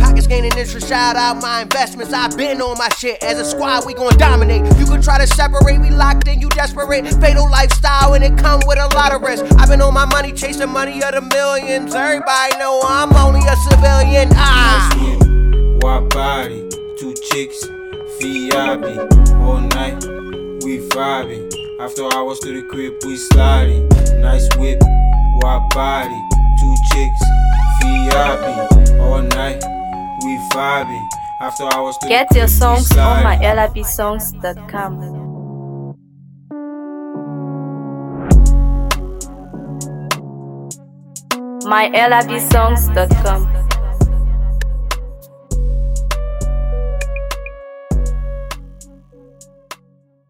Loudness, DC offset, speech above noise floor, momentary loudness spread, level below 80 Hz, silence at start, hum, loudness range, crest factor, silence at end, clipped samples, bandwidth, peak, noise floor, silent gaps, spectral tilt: -14 LUFS; under 0.1%; 41 dB; 15 LU; -14 dBFS; 0 s; none; 10 LU; 12 dB; 0.55 s; under 0.1%; 17.5 kHz; 0 dBFS; -53 dBFS; none; -5 dB/octave